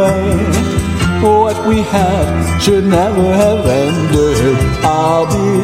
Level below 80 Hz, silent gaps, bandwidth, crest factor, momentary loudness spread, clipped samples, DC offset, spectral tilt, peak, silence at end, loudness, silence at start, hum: -26 dBFS; none; 15.5 kHz; 12 dB; 3 LU; under 0.1%; 0.4%; -6 dB/octave; 0 dBFS; 0 s; -12 LUFS; 0 s; none